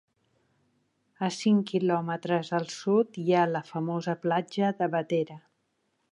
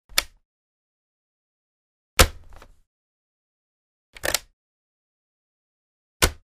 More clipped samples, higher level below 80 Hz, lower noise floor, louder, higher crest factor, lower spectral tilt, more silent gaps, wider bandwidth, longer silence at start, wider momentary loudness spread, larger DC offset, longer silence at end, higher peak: neither; second, -80 dBFS vs -36 dBFS; first, -75 dBFS vs -45 dBFS; second, -28 LUFS vs -23 LUFS; second, 18 dB vs 30 dB; first, -6.5 dB/octave vs -2 dB/octave; second, none vs 0.45-2.17 s, 2.87-4.13 s, 4.53-6.20 s; second, 11 kHz vs 15.5 kHz; first, 1.2 s vs 0.15 s; second, 7 LU vs 10 LU; neither; first, 0.75 s vs 0.25 s; second, -12 dBFS vs 0 dBFS